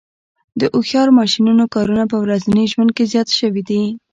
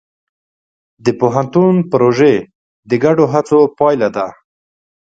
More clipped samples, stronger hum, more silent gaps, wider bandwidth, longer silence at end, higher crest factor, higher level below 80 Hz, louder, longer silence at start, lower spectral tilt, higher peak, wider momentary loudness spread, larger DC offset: neither; neither; second, none vs 2.55-2.83 s; about the same, 7.8 kHz vs 7.8 kHz; second, 0.15 s vs 0.7 s; about the same, 12 dB vs 14 dB; about the same, -52 dBFS vs -56 dBFS; about the same, -15 LUFS vs -13 LUFS; second, 0.55 s vs 1.05 s; second, -5.5 dB/octave vs -7.5 dB/octave; about the same, -2 dBFS vs 0 dBFS; about the same, 7 LU vs 8 LU; neither